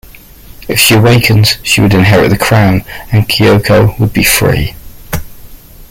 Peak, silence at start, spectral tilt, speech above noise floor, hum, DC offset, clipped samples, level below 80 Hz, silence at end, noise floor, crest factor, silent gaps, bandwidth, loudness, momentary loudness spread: 0 dBFS; 0.6 s; -4.5 dB/octave; 25 dB; none; under 0.1%; under 0.1%; -28 dBFS; 0.05 s; -33 dBFS; 10 dB; none; 17 kHz; -8 LUFS; 14 LU